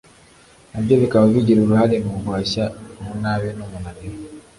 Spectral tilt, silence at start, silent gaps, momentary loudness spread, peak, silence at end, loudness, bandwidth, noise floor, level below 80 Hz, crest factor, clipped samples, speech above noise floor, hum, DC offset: -7.5 dB/octave; 0.75 s; none; 19 LU; -4 dBFS; 0.2 s; -18 LUFS; 11.5 kHz; -49 dBFS; -44 dBFS; 16 dB; under 0.1%; 31 dB; none; under 0.1%